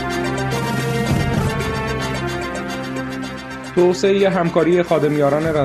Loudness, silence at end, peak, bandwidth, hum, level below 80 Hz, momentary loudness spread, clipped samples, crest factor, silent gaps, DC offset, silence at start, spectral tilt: -19 LUFS; 0 s; -2 dBFS; 13.5 kHz; none; -38 dBFS; 10 LU; under 0.1%; 16 dB; none; under 0.1%; 0 s; -6 dB/octave